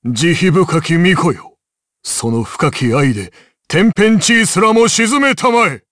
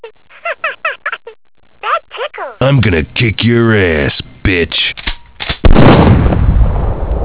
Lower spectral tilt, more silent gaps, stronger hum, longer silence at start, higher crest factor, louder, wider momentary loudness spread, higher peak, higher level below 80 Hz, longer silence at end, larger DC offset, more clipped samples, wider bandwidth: second, -4.5 dB/octave vs -10.5 dB/octave; neither; neither; about the same, 0.05 s vs 0.05 s; about the same, 12 dB vs 12 dB; about the same, -12 LUFS vs -12 LUFS; second, 8 LU vs 14 LU; about the same, -2 dBFS vs 0 dBFS; second, -48 dBFS vs -18 dBFS; first, 0.15 s vs 0 s; neither; second, under 0.1% vs 2%; first, 11 kHz vs 4 kHz